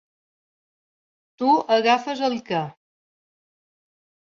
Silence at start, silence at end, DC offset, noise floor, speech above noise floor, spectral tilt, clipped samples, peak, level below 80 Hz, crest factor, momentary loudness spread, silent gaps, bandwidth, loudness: 1.4 s; 1.65 s; under 0.1%; under -90 dBFS; over 69 dB; -5 dB/octave; under 0.1%; -6 dBFS; -72 dBFS; 20 dB; 9 LU; none; 7.4 kHz; -21 LUFS